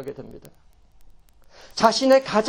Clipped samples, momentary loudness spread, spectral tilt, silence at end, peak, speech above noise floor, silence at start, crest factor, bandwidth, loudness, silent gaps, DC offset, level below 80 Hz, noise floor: under 0.1%; 24 LU; -3.5 dB/octave; 0 s; -2 dBFS; 29 dB; 0 s; 22 dB; 17 kHz; -18 LUFS; none; under 0.1%; -54 dBFS; -49 dBFS